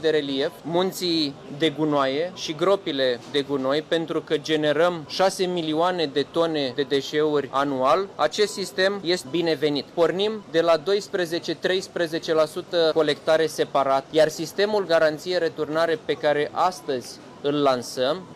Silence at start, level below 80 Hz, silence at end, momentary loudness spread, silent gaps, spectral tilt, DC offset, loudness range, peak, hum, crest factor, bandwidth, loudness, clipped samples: 0 s; -66 dBFS; 0 s; 5 LU; none; -4.5 dB/octave; under 0.1%; 2 LU; -8 dBFS; none; 16 dB; 15 kHz; -23 LUFS; under 0.1%